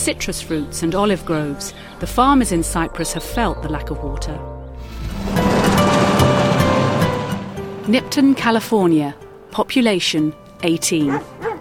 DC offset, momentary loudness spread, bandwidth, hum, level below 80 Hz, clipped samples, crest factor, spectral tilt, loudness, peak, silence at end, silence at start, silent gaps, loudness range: under 0.1%; 14 LU; 18 kHz; none; -34 dBFS; under 0.1%; 16 dB; -5 dB/octave; -18 LUFS; -2 dBFS; 0 s; 0 s; none; 4 LU